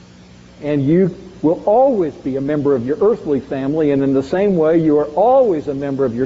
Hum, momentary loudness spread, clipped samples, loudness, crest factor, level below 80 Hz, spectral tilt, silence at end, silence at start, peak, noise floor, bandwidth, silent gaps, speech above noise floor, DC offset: none; 7 LU; under 0.1%; -16 LUFS; 12 dB; -48 dBFS; -8 dB/octave; 0 s; 0.6 s; -4 dBFS; -42 dBFS; 7.6 kHz; none; 27 dB; under 0.1%